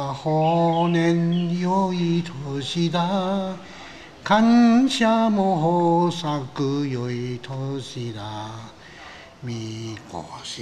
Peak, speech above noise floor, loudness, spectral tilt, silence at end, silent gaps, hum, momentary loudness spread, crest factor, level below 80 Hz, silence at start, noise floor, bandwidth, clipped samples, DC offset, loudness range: -6 dBFS; 21 dB; -22 LUFS; -6.5 dB/octave; 0 s; none; none; 18 LU; 16 dB; -58 dBFS; 0 s; -43 dBFS; 10 kHz; under 0.1%; 0.3%; 11 LU